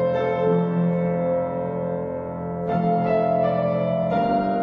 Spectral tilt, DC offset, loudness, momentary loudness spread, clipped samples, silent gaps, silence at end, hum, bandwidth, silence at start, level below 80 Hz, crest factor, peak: -10.5 dB/octave; under 0.1%; -23 LUFS; 7 LU; under 0.1%; none; 0 s; none; 5.2 kHz; 0 s; -56 dBFS; 14 dB; -8 dBFS